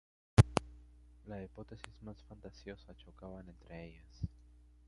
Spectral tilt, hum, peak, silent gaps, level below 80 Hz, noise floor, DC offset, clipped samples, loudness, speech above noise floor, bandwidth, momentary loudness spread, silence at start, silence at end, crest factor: -6.5 dB/octave; 60 Hz at -60 dBFS; -8 dBFS; none; -48 dBFS; -61 dBFS; under 0.1%; under 0.1%; -34 LUFS; 12 dB; 11 kHz; 25 LU; 0.4 s; 0.6 s; 30 dB